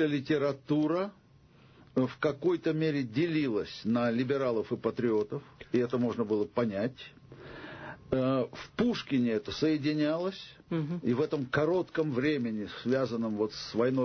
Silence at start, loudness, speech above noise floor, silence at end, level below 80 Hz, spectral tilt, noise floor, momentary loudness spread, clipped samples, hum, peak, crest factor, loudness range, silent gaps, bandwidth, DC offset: 0 s; -31 LUFS; 29 dB; 0 s; -62 dBFS; -7 dB/octave; -59 dBFS; 8 LU; under 0.1%; none; -16 dBFS; 14 dB; 2 LU; none; 6.6 kHz; under 0.1%